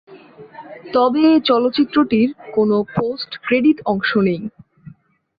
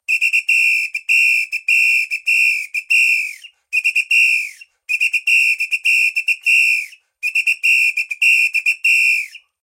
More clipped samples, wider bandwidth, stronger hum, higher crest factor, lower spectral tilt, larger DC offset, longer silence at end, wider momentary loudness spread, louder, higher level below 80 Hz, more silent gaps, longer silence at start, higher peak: neither; second, 5 kHz vs 16.5 kHz; neither; about the same, 14 dB vs 12 dB; first, -8.5 dB/octave vs 8 dB/octave; neither; first, 0.5 s vs 0.25 s; first, 12 LU vs 7 LU; second, -17 LUFS vs -13 LUFS; first, -56 dBFS vs -88 dBFS; neither; about the same, 0.1 s vs 0.1 s; about the same, -4 dBFS vs -4 dBFS